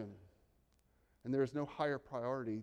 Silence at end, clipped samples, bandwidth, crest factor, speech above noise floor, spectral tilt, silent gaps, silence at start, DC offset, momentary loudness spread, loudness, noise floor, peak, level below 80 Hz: 0 s; under 0.1%; 10 kHz; 18 dB; 35 dB; -7.5 dB/octave; none; 0 s; under 0.1%; 10 LU; -39 LUFS; -74 dBFS; -22 dBFS; -74 dBFS